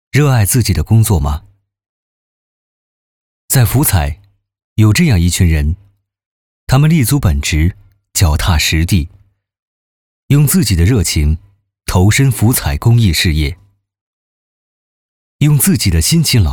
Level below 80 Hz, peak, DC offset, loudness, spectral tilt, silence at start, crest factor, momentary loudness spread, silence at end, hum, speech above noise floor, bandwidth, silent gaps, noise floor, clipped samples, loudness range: -24 dBFS; 0 dBFS; under 0.1%; -12 LUFS; -5 dB/octave; 0.15 s; 14 dB; 9 LU; 0 s; none; over 79 dB; over 20 kHz; 1.89-3.48 s, 4.64-4.76 s, 6.26-6.67 s, 9.59-10.29 s, 14.01-15.39 s; under -90 dBFS; under 0.1%; 4 LU